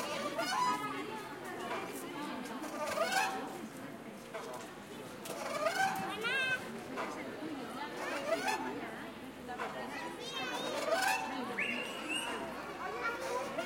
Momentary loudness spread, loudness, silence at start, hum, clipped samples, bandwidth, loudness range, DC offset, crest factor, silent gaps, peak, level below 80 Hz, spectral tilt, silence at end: 12 LU; -38 LUFS; 0 s; none; under 0.1%; 16.5 kHz; 3 LU; under 0.1%; 18 dB; none; -20 dBFS; -72 dBFS; -2.5 dB/octave; 0 s